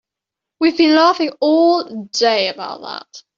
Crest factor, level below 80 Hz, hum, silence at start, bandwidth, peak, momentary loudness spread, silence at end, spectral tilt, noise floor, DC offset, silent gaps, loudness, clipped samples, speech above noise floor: 14 dB; -66 dBFS; none; 0.6 s; 7.4 kHz; -2 dBFS; 16 LU; 0.2 s; -3 dB/octave; -84 dBFS; under 0.1%; none; -15 LUFS; under 0.1%; 68 dB